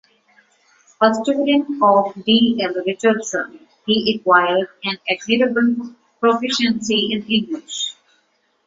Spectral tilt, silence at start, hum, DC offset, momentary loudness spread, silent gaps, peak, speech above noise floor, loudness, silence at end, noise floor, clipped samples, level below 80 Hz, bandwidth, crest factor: -4 dB/octave; 1 s; none; under 0.1%; 10 LU; none; -2 dBFS; 46 dB; -18 LUFS; 0.75 s; -64 dBFS; under 0.1%; -60 dBFS; 7.8 kHz; 18 dB